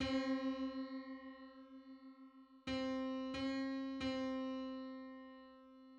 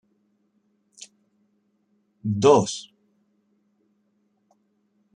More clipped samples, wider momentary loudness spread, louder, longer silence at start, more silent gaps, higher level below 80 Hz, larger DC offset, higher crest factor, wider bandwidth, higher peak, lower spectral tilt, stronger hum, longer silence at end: neither; second, 18 LU vs 28 LU; second, -43 LUFS vs -21 LUFS; second, 0 s vs 2.25 s; neither; about the same, -68 dBFS vs -72 dBFS; neither; second, 16 dB vs 26 dB; second, 8 kHz vs 10 kHz; second, -28 dBFS vs -2 dBFS; about the same, -5.5 dB/octave vs -5.5 dB/octave; neither; second, 0 s vs 2.35 s